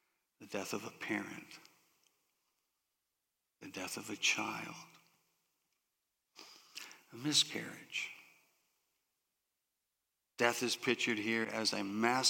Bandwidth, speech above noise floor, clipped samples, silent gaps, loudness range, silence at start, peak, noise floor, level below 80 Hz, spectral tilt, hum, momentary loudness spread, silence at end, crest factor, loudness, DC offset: 17 kHz; 51 dB; under 0.1%; none; 9 LU; 0.4 s; -14 dBFS; -88 dBFS; -90 dBFS; -2 dB/octave; none; 23 LU; 0 s; 28 dB; -36 LUFS; under 0.1%